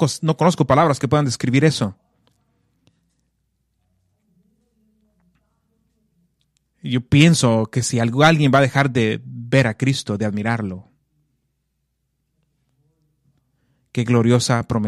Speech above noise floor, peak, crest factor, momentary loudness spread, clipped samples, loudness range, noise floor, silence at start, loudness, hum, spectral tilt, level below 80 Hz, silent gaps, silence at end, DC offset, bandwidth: 55 dB; -2 dBFS; 20 dB; 11 LU; under 0.1%; 14 LU; -72 dBFS; 0 s; -18 LUFS; none; -5.5 dB/octave; -52 dBFS; none; 0 s; under 0.1%; 13.5 kHz